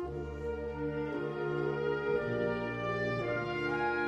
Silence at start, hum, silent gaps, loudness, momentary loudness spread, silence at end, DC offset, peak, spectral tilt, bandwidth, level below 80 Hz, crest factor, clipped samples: 0 s; none; none; -35 LUFS; 6 LU; 0 s; under 0.1%; -20 dBFS; -7.5 dB/octave; 8.2 kHz; -52 dBFS; 14 dB; under 0.1%